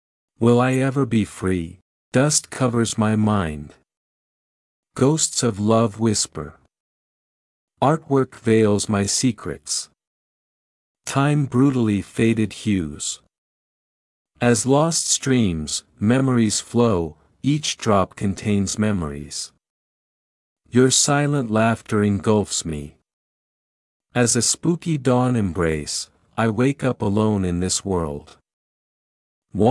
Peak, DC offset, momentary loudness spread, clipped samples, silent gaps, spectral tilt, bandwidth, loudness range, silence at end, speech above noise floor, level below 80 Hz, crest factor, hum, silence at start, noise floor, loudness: -2 dBFS; under 0.1%; 11 LU; under 0.1%; 1.82-2.12 s, 3.97-4.83 s, 6.80-7.68 s, 10.07-10.95 s, 13.38-14.25 s, 19.70-20.56 s, 23.13-24.00 s, 28.53-29.42 s; -5 dB/octave; 12 kHz; 3 LU; 0 s; over 70 dB; -50 dBFS; 18 dB; none; 0.4 s; under -90 dBFS; -20 LUFS